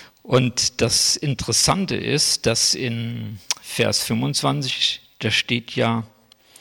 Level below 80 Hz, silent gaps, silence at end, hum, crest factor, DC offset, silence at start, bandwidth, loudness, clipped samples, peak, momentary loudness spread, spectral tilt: -50 dBFS; none; 0.55 s; none; 16 dB; under 0.1%; 0 s; 17 kHz; -20 LUFS; under 0.1%; -6 dBFS; 9 LU; -3 dB/octave